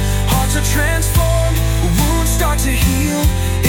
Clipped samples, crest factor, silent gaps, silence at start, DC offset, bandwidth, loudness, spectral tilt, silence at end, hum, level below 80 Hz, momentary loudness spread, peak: under 0.1%; 12 dB; none; 0 s; under 0.1%; 18 kHz; -15 LUFS; -4.5 dB/octave; 0 s; none; -18 dBFS; 1 LU; -2 dBFS